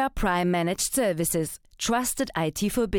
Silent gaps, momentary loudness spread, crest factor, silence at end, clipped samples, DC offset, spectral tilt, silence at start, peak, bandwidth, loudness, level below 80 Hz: none; 4 LU; 12 dB; 0 s; under 0.1%; under 0.1%; -4 dB/octave; 0 s; -12 dBFS; 19 kHz; -26 LUFS; -42 dBFS